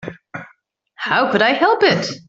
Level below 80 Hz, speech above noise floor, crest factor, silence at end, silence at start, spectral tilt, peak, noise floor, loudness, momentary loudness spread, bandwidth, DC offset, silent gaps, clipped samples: -60 dBFS; 41 dB; 16 dB; 0.1 s; 0 s; -4.5 dB/octave; -2 dBFS; -57 dBFS; -15 LUFS; 20 LU; 7.8 kHz; under 0.1%; none; under 0.1%